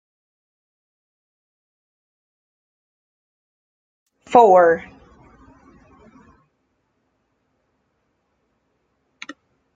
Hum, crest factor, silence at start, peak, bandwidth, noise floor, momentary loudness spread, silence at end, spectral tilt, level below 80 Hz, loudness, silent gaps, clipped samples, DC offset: none; 24 dB; 4.3 s; 0 dBFS; 7.8 kHz; -70 dBFS; 27 LU; 4.95 s; -6 dB/octave; -62 dBFS; -14 LUFS; none; under 0.1%; under 0.1%